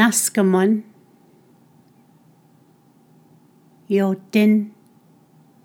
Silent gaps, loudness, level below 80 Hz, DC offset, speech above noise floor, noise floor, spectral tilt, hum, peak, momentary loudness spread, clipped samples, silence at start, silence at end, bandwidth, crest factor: none; -18 LUFS; -86 dBFS; under 0.1%; 37 dB; -54 dBFS; -4.5 dB/octave; none; 0 dBFS; 7 LU; under 0.1%; 0 s; 0.95 s; 18.5 kHz; 22 dB